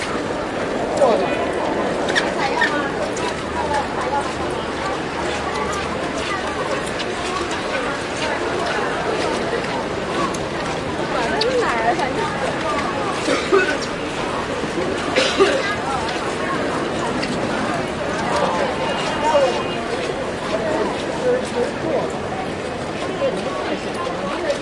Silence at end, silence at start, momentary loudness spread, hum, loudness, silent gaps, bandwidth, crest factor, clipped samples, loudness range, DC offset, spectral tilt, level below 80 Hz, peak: 0 s; 0 s; 6 LU; none; -21 LUFS; none; 11.5 kHz; 18 dB; under 0.1%; 3 LU; under 0.1%; -4 dB/octave; -44 dBFS; -2 dBFS